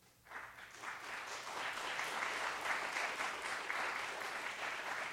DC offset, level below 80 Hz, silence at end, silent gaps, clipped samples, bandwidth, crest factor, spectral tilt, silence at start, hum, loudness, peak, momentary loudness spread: under 0.1%; -78 dBFS; 0 s; none; under 0.1%; 16 kHz; 20 dB; -0.5 dB/octave; 0 s; none; -41 LUFS; -24 dBFS; 11 LU